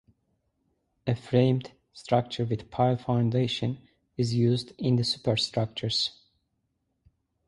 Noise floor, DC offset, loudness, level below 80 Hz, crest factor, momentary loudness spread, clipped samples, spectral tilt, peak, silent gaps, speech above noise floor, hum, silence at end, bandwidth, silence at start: -77 dBFS; under 0.1%; -27 LUFS; -58 dBFS; 20 dB; 9 LU; under 0.1%; -6.5 dB/octave; -8 dBFS; none; 51 dB; none; 1.35 s; 11.5 kHz; 1.05 s